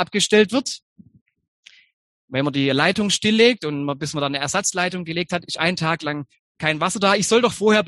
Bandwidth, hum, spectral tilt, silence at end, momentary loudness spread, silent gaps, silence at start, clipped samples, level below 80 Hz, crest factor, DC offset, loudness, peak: 12.5 kHz; none; -3.5 dB/octave; 0 s; 9 LU; 0.82-0.96 s, 1.21-1.26 s, 1.48-1.63 s, 1.93-2.28 s, 6.39-6.55 s; 0 s; under 0.1%; -58 dBFS; 20 dB; under 0.1%; -20 LUFS; -2 dBFS